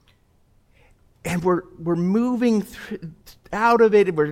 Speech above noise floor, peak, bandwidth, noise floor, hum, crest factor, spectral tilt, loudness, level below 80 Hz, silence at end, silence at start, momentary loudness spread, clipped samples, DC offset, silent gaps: 39 dB; -4 dBFS; 16 kHz; -59 dBFS; none; 18 dB; -7 dB/octave; -20 LUFS; -54 dBFS; 0 s; 1.25 s; 19 LU; under 0.1%; under 0.1%; none